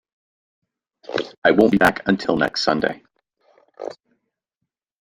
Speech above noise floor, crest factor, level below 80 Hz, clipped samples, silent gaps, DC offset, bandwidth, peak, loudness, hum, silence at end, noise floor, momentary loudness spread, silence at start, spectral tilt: 63 dB; 20 dB; -52 dBFS; under 0.1%; 1.38-1.42 s; under 0.1%; 14 kHz; -2 dBFS; -19 LUFS; none; 1.1 s; -81 dBFS; 20 LU; 1.1 s; -5.5 dB/octave